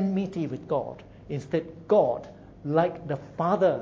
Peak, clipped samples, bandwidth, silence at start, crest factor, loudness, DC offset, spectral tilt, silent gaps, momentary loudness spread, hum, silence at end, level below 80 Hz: -8 dBFS; under 0.1%; 7.6 kHz; 0 s; 18 dB; -27 LUFS; under 0.1%; -8.5 dB/octave; none; 15 LU; none; 0 s; -58 dBFS